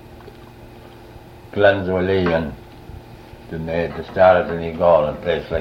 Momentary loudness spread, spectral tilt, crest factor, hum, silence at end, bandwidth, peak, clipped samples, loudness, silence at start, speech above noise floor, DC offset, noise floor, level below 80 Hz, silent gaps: 25 LU; -7.5 dB/octave; 18 dB; none; 0 s; 6.4 kHz; -2 dBFS; under 0.1%; -18 LUFS; 0.05 s; 23 dB; under 0.1%; -40 dBFS; -42 dBFS; none